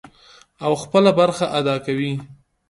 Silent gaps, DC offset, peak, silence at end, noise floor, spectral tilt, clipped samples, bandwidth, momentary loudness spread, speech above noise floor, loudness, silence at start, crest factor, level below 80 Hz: none; under 0.1%; -2 dBFS; 0.35 s; -50 dBFS; -6 dB/octave; under 0.1%; 11.5 kHz; 11 LU; 32 dB; -19 LUFS; 0.6 s; 18 dB; -58 dBFS